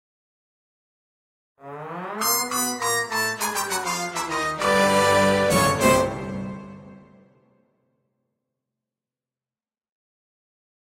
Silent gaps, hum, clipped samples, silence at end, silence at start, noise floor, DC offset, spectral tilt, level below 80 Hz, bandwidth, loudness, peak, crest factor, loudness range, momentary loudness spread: none; none; under 0.1%; 4 s; 1.65 s; under -90 dBFS; under 0.1%; -3 dB/octave; -52 dBFS; 16 kHz; -21 LUFS; -4 dBFS; 22 dB; 7 LU; 17 LU